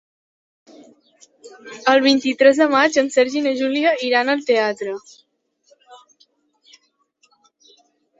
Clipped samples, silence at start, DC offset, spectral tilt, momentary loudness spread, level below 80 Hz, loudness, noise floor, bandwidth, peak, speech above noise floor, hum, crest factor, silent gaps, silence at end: under 0.1%; 1.45 s; under 0.1%; -2.5 dB/octave; 11 LU; -70 dBFS; -17 LUFS; -63 dBFS; 8 kHz; -2 dBFS; 45 dB; none; 20 dB; none; 2.25 s